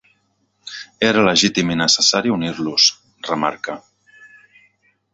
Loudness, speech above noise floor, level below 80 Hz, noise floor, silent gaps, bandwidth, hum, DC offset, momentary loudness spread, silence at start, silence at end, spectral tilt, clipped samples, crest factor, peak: -16 LUFS; 48 dB; -56 dBFS; -65 dBFS; none; 8.2 kHz; none; under 0.1%; 19 LU; 0.65 s; 0.9 s; -2.5 dB/octave; under 0.1%; 20 dB; 0 dBFS